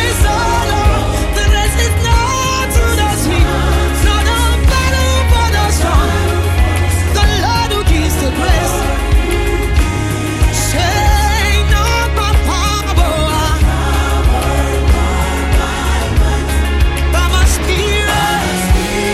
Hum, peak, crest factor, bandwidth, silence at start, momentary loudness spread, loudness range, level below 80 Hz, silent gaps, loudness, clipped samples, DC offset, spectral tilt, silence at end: none; 0 dBFS; 10 dB; 15.5 kHz; 0 s; 3 LU; 2 LU; -14 dBFS; none; -13 LUFS; under 0.1%; under 0.1%; -4.5 dB/octave; 0 s